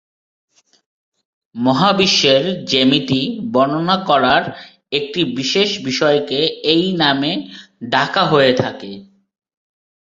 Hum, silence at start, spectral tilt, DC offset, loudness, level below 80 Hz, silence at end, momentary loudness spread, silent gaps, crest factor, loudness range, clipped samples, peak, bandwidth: none; 1.55 s; -4.5 dB/octave; under 0.1%; -15 LUFS; -56 dBFS; 1.15 s; 13 LU; none; 18 dB; 2 LU; under 0.1%; 0 dBFS; 7.8 kHz